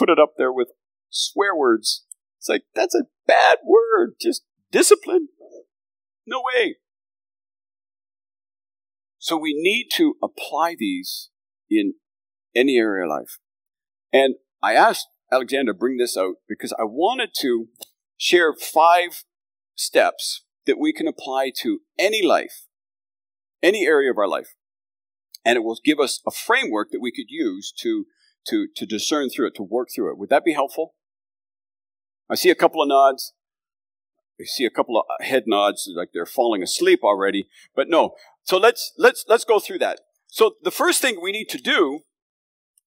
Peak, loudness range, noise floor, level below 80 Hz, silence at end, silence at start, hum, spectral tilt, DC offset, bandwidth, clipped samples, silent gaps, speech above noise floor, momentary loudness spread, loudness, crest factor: 0 dBFS; 5 LU; under -90 dBFS; -86 dBFS; 0.9 s; 0 s; none; -2.5 dB/octave; under 0.1%; 16 kHz; under 0.1%; none; over 70 dB; 12 LU; -20 LUFS; 20 dB